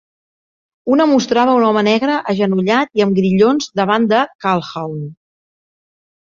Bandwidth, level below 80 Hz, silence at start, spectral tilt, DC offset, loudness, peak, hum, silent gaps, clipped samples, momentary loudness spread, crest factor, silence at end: 7.4 kHz; -58 dBFS; 0.85 s; -6 dB/octave; under 0.1%; -15 LUFS; -2 dBFS; none; 4.35-4.39 s; under 0.1%; 12 LU; 14 dB; 1.1 s